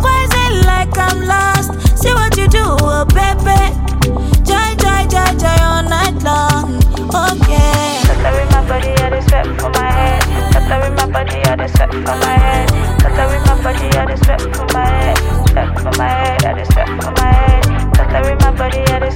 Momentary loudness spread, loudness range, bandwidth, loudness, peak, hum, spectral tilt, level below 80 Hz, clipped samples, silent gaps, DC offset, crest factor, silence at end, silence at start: 3 LU; 1 LU; 17 kHz; -13 LUFS; 0 dBFS; none; -5 dB/octave; -14 dBFS; under 0.1%; none; under 0.1%; 10 dB; 0 s; 0 s